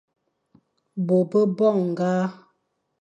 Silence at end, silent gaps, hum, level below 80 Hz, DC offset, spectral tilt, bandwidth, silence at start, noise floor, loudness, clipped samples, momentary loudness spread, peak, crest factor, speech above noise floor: 0.7 s; none; none; -74 dBFS; under 0.1%; -8.5 dB/octave; 8.6 kHz; 0.95 s; -72 dBFS; -22 LUFS; under 0.1%; 11 LU; -8 dBFS; 16 dB; 51 dB